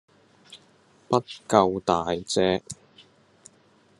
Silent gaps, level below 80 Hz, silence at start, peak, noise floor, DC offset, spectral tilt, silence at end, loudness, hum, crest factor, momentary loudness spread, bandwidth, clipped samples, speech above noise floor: none; -66 dBFS; 0.5 s; -2 dBFS; -60 dBFS; under 0.1%; -5 dB/octave; 1.25 s; -24 LUFS; none; 26 dB; 10 LU; 12 kHz; under 0.1%; 36 dB